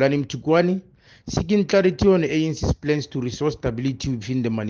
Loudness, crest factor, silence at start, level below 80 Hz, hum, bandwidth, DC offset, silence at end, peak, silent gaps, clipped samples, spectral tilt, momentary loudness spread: -22 LUFS; 16 dB; 0 s; -40 dBFS; none; 7.4 kHz; under 0.1%; 0 s; -6 dBFS; none; under 0.1%; -6.5 dB/octave; 10 LU